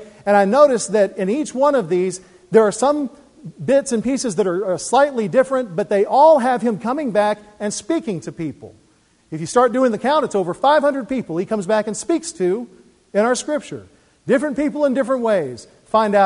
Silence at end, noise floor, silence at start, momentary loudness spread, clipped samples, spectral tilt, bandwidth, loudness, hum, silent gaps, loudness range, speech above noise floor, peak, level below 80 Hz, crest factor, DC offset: 0 s; -57 dBFS; 0 s; 12 LU; under 0.1%; -5 dB/octave; 11 kHz; -18 LUFS; none; none; 4 LU; 39 dB; 0 dBFS; -58 dBFS; 18 dB; under 0.1%